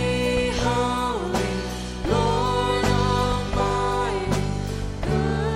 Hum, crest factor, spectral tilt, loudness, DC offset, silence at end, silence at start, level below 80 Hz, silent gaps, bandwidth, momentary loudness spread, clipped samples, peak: none; 16 dB; -5.5 dB/octave; -24 LUFS; under 0.1%; 0 s; 0 s; -32 dBFS; none; 16 kHz; 7 LU; under 0.1%; -8 dBFS